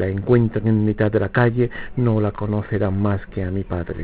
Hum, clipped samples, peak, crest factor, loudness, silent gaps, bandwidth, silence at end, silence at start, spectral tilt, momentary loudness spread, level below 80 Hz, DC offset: none; under 0.1%; -2 dBFS; 16 dB; -20 LUFS; none; 4 kHz; 0 s; 0 s; -12.5 dB/octave; 8 LU; -38 dBFS; 0.4%